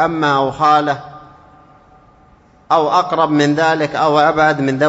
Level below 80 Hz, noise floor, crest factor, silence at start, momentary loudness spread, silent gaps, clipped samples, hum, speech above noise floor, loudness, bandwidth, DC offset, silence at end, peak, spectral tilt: -52 dBFS; -48 dBFS; 14 dB; 0 s; 3 LU; none; under 0.1%; none; 34 dB; -14 LUFS; 8 kHz; under 0.1%; 0 s; 0 dBFS; -5.5 dB/octave